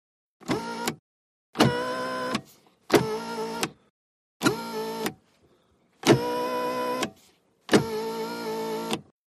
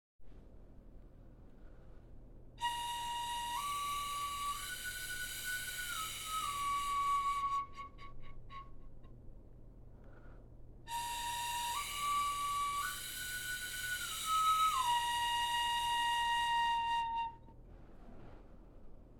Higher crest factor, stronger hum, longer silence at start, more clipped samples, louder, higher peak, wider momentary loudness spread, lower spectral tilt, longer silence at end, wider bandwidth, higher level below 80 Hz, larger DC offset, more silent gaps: first, 24 dB vs 16 dB; neither; first, 0.4 s vs 0.2 s; neither; first, -27 LUFS vs -36 LUFS; first, -4 dBFS vs -22 dBFS; second, 10 LU vs 19 LU; first, -4.5 dB/octave vs 0 dB/octave; first, 0.25 s vs 0 s; second, 15 kHz vs 18 kHz; second, -62 dBFS vs -56 dBFS; neither; first, 0.99-1.53 s, 3.90-4.40 s vs none